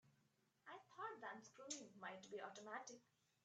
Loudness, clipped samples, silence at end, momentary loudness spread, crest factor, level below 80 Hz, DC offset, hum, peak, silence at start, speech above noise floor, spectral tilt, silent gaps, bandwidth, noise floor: -55 LUFS; under 0.1%; 0.4 s; 9 LU; 22 dB; under -90 dBFS; under 0.1%; none; -36 dBFS; 0.05 s; 27 dB; -2 dB/octave; none; 8.8 kHz; -83 dBFS